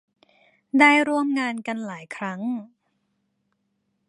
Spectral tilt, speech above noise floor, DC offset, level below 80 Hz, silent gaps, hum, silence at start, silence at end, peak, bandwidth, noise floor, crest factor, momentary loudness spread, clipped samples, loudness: -4.5 dB/octave; 52 dB; under 0.1%; -80 dBFS; none; none; 0.75 s; 1.45 s; -2 dBFS; 11 kHz; -74 dBFS; 24 dB; 16 LU; under 0.1%; -22 LUFS